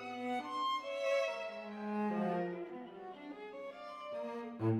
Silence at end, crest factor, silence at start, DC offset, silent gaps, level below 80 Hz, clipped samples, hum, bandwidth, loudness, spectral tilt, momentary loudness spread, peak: 0 s; 16 dB; 0 s; under 0.1%; none; -82 dBFS; under 0.1%; none; 14 kHz; -40 LUFS; -6.5 dB/octave; 13 LU; -24 dBFS